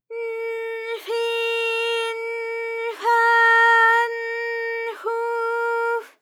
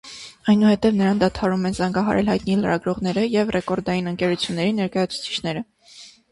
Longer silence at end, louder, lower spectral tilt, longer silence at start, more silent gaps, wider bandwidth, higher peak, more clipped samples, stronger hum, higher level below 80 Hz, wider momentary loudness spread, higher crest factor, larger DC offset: about the same, 0.15 s vs 0.25 s; about the same, -21 LUFS vs -21 LUFS; second, 2.5 dB/octave vs -6 dB/octave; about the same, 0.1 s vs 0.05 s; neither; first, 16 kHz vs 11.5 kHz; about the same, -6 dBFS vs -6 dBFS; neither; neither; second, under -90 dBFS vs -48 dBFS; first, 14 LU vs 8 LU; about the same, 16 dB vs 16 dB; neither